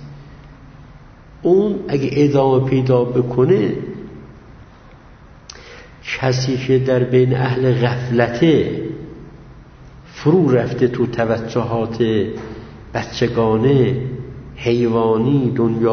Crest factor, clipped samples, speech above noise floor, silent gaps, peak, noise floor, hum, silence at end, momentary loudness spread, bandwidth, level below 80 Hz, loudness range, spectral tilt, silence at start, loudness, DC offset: 16 dB; under 0.1%; 27 dB; none; 0 dBFS; -42 dBFS; none; 0 s; 18 LU; 6.6 kHz; -44 dBFS; 4 LU; -7.5 dB/octave; 0 s; -17 LUFS; under 0.1%